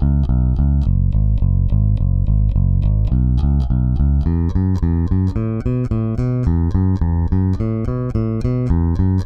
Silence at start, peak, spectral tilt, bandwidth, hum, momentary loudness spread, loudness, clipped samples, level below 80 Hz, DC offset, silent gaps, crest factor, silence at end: 0 s; -4 dBFS; -11 dB/octave; 5.8 kHz; none; 3 LU; -18 LUFS; under 0.1%; -20 dBFS; under 0.1%; none; 12 dB; 0 s